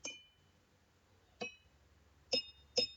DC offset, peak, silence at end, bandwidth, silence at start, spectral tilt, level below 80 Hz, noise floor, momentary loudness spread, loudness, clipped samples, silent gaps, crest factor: under 0.1%; -20 dBFS; 0 s; 19 kHz; 0.05 s; -1 dB/octave; -74 dBFS; -71 dBFS; 11 LU; -40 LUFS; under 0.1%; none; 26 dB